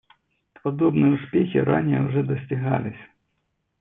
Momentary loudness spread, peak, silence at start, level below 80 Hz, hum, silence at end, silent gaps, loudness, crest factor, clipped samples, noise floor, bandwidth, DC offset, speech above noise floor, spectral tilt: 9 LU; -6 dBFS; 0.65 s; -60 dBFS; none; 0.75 s; none; -22 LUFS; 18 dB; under 0.1%; -74 dBFS; 3.8 kHz; under 0.1%; 52 dB; -12 dB/octave